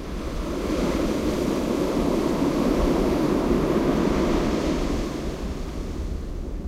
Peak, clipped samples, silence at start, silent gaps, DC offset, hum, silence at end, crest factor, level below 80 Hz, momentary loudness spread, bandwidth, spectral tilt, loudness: -10 dBFS; under 0.1%; 0 s; none; under 0.1%; none; 0 s; 14 dB; -32 dBFS; 10 LU; 16 kHz; -6.5 dB/octave; -25 LUFS